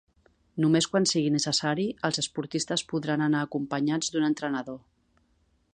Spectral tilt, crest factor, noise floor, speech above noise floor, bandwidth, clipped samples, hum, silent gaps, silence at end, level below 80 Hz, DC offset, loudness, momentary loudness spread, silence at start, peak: -4 dB/octave; 18 dB; -68 dBFS; 41 dB; 10 kHz; under 0.1%; none; none; 0.95 s; -66 dBFS; under 0.1%; -27 LUFS; 8 LU; 0.55 s; -10 dBFS